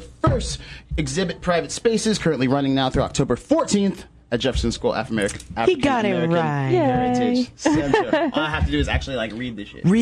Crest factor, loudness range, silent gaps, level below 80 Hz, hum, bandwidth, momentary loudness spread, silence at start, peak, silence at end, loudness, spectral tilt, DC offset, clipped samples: 18 dB; 2 LU; none; -36 dBFS; none; 12 kHz; 7 LU; 0 s; -2 dBFS; 0 s; -21 LUFS; -5.5 dB/octave; under 0.1%; under 0.1%